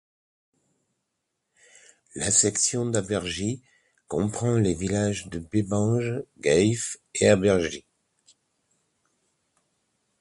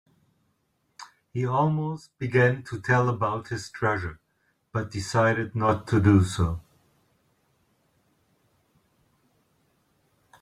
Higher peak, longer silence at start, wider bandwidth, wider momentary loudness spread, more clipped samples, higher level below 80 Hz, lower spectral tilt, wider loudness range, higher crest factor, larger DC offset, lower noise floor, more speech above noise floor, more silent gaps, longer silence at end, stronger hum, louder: about the same, -6 dBFS vs -6 dBFS; first, 2.15 s vs 1 s; about the same, 11.5 kHz vs 12 kHz; about the same, 12 LU vs 14 LU; neither; about the same, -52 dBFS vs -54 dBFS; second, -4.5 dB/octave vs -7 dB/octave; about the same, 3 LU vs 3 LU; about the same, 20 dB vs 22 dB; neither; first, -80 dBFS vs -72 dBFS; first, 56 dB vs 48 dB; neither; second, 2.4 s vs 3.8 s; neither; about the same, -24 LUFS vs -25 LUFS